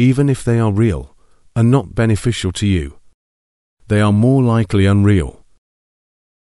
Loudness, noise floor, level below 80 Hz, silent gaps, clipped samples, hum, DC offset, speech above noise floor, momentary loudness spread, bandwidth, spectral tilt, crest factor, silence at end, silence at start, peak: -15 LUFS; under -90 dBFS; -36 dBFS; 3.14-3.77 s; under 0.1%; none; 0.3%; over 76 dB; 8 LU; 12 kHz; -7 dB/octave; 16 dB; 1.25 s; 0 s; 0 dBFS